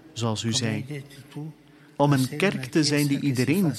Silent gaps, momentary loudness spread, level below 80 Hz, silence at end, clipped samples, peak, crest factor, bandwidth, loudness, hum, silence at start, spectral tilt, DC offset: none; 17 LU; -64 dBFS; 0 s; under 0.1%; -6 dBFS; 18 dB; 14.5 kHz; -24 LUFS; none; 0.05 s; -5 dB/octave; under 0.1%